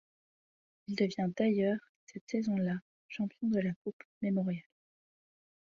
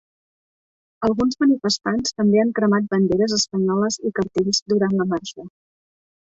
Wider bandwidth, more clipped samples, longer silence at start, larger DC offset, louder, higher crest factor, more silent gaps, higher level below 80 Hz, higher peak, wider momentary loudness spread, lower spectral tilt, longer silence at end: about the same, 7.4 kHz vs 8 kHz; neither; about the same, 0.9 s vs 1 s; neither; second, -35 LUFS vs -20 LUFS; about the same, 18 dB vs 14 dB; first, 1.89-2.07 s, 2.21-2.27 s, 2.82-3.09 s, 3.76-3.85 s, 3.93-3.99 s, 4.05-4.21 s vs 4.62-4.66 s; second, -76 dBFS vs -54 dBFS; second, -18 dBFS vs -6 dBFS; first, 14 LU vs 6 LU; first, -7.5 dB/octave vs -4.5 dB/octave; first, 1.05 s vs 0.8 s